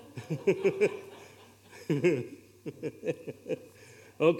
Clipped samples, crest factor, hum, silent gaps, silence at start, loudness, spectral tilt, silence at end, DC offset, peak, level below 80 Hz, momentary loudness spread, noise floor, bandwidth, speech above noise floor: under 0.1%; 20 dB; none; none; 0 s; -32 LUFS; -7 dB/octave; 0 s; under 0.1%; -12 dBFS; -78 dBFS; 24 LU; -55 dBFS; 16 kHz; 24 dB